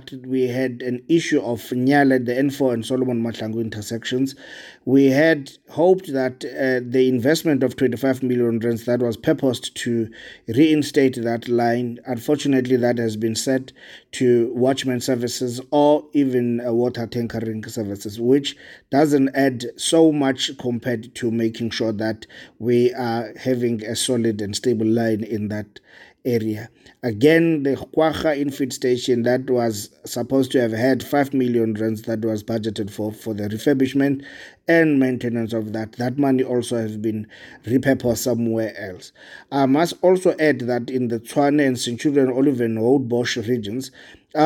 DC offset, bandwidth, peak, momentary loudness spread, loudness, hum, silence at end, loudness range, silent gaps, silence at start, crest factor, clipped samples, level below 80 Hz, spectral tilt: under 0.1%; 17 kHz; -4 dBFS; 11 LU; -21 LUFS; none; 0 s; 3 LU; none; 0.1 s; 16 dB; under 0.1%; -60 dBFS; -5.5 dB/octave